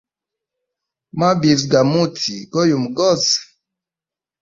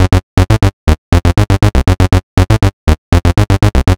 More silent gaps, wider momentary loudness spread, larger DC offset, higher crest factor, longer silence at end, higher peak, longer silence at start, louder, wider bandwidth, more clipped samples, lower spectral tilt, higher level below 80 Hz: second, none vs 0.23-0.37 s, 0.73-0.87 s, 0.98-1.12 s, 2.23-2.37 s, 2.73-2.87 s, 2.98-3.12 s; first, 6 LU vs 2 LU; second, under 0.1% vs 1%; first, 18 dB vs 10 dB; first, 1 s vs 0 s; about the same, -2 dBFS vs 0 dBFS; first, 1.15 s vs 0 s; second, -16 LUFS vs -11 LUFS; second, 7.8 kHz vs 15.5 kHz; neither; second, -4.5 dB/octave vs -6.5 dB/octave; second, -56 dBFS vs -16 dBFS